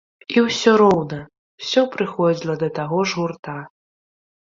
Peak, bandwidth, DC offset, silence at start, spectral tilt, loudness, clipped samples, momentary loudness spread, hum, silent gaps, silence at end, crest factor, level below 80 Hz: -2 dBFS; 7.8 kHz; under 0.1%; 0.3 s; -5.5 dB/octave; -19 LUFS; under 0.1%; 17 LU; none; 1.38-1.58 s, 3.39-3.43 s; 0.9 s; 18 dB; -60 dBFS